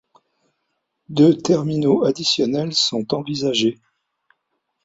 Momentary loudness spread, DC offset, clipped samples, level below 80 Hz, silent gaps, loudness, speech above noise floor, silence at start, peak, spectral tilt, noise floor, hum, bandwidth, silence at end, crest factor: 8 LU; under 0.1%; under 0.1%; -60 dBFS; none; -19 LUFS; 56 dB; 1.1 s; -2 dBFS; -5 dB/octave; -74 dBFS; none; 8 kHz; 1.1 s; 18 dB